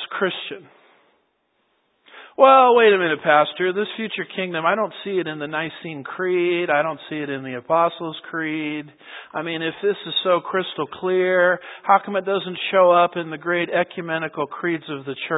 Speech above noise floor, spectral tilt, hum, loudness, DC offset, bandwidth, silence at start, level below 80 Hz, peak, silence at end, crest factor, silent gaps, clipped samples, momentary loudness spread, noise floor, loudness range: 48 dB; -9.5 dB/octave; none; -20 LUFS; under 0.1%; 4 kHz; 0 s; -74 dBFS; 0 dBFS; 0 s; 20 dB; none; under 0.1%; 14 LU; -68 dBFS; 6 LU